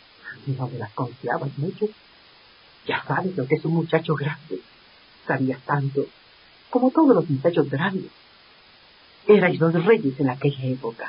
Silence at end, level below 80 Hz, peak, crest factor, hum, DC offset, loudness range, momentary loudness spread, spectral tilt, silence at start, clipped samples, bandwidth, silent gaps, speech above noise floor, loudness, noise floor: 0 s; -66 dBFS; -4 dBFS; 20 dB; none; under 0.1%; 6 LU; 15 LU; -12 dB/octave; 0.25 s; under 0.1%; 5.4 kHz; none; 30 dB; -23 LUFS; -52 dBFS